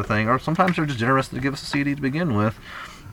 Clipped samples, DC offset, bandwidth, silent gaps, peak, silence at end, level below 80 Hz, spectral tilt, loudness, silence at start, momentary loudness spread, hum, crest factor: under 0.1%; under 0.1%; 17.5 kHz; none; -4 dBFS; 0 s; -46 dBFS; -6.5 dB/octave; -22 LUFS; 0 s; 9 LU; none; 20 dB